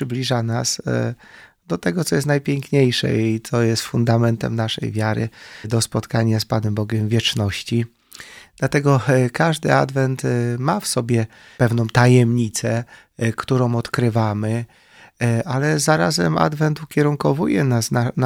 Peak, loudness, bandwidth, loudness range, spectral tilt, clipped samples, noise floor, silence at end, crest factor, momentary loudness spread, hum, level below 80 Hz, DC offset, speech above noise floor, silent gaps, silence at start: 0 dBFS; -19 LUFS; 16.5 kHz; 3 LU; -5.5 dB/octave; under 0.1%; -41 dBFS; 0 s; 20 dB; 8 LU; none; -52 dBFS; under 0.1%; 23 dB; none; 0 s